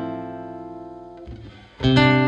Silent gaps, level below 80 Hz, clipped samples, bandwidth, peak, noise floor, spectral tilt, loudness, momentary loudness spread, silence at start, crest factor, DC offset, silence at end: none; -42 dBFS; under 0.1%; 8.4 kHz; -4 dBFS; -40 dBFS; -7 dB/octave; -20 LUFS; 23 LU; 0 s; 20 dB; under 0.1%; 0 s